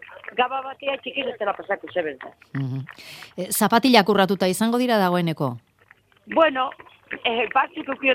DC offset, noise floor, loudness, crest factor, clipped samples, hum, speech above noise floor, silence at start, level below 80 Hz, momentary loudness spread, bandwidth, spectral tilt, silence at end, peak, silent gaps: under 0.1%; -57 dBFS; -22 LUFS; 22 dB; under 0.1%; none; 34 dB; 0 s; -66 dBFS; 16 LU; 16.5 kHz; -4.5 dB/octave; 0 s; 0 dBFS; none